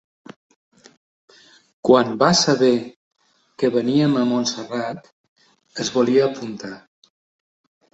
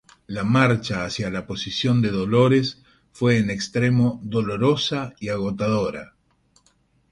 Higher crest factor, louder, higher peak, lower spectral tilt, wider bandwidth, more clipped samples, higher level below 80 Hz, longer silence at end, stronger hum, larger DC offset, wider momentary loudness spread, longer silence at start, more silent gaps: about the same, 20 dB vs 20 dB; first, -19 LUFS vs -22 LUFS; about the same, -2 dBFS vs -2 dBFS; second, -4.5 dB/octave vs -6.5 dB/octave; second, 8.2 kHz vs 11 kHz; neither; second, -64 dBFS vs -50 dBFS; about the same, 1.15 s vs 1.05 s; neither; neither; first, 20 LU vs 10 LU; first, 1.85 s vs 0.3 s; first, 2.96-3.11 s, 5.12-5.36 s vs none